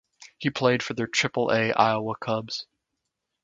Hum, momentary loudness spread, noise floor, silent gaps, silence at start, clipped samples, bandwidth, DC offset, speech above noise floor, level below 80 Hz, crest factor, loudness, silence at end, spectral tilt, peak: none; 9 LU; -82 dBFS; none; 0.2 s; under 0.1%; 9.4 kHz; under 0.1%; 57 dB; -66 dBFS; 24 dB; -25 LUFS; 0.8 s; -4.5 dB/octave; -4 dBFS